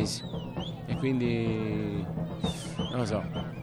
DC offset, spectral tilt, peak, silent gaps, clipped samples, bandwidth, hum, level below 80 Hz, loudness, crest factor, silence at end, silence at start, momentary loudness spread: under 0.1%; -6 dB/octave; -16 dBFS; none; under 0.1%; 13.5 kHz; none; -50 dBFS; -32 LUFS; 16 dB; 0 s; 0 s; 8 LU